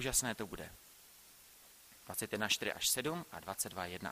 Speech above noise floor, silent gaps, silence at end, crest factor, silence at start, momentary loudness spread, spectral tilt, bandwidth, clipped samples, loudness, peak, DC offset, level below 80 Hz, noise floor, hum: 22 dB; none; 0 s; 24 dB; 0 s; 24 LU; -1.5 dB/octave; 15.5 kHz; under 0.1%; -37 LUFS; -18 dBFS; under 0.1%; -62 dBFS; -61 dBFS; none